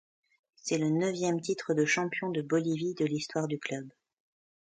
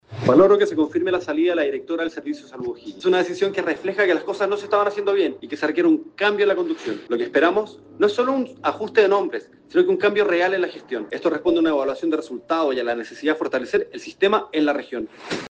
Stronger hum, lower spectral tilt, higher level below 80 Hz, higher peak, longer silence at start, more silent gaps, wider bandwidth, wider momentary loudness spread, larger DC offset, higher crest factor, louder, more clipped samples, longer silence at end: neither; about the same, -5 dB/octave vs -5.5 dB/octave; second, -76 dBFS vs -64 dBFS; second, -16 dBFS vs -4 dBFS; first, 0.65 s vs 0.1 s; neither; about the same, 9.4 kHz vs 8.6 kHz; about the same, 9 LU vs 11 LU; neither; about the same, 16 dB vs 18 dB; second, -31 LUFS vs -21 LUFS; neither; first, 0.8 s vs 0 s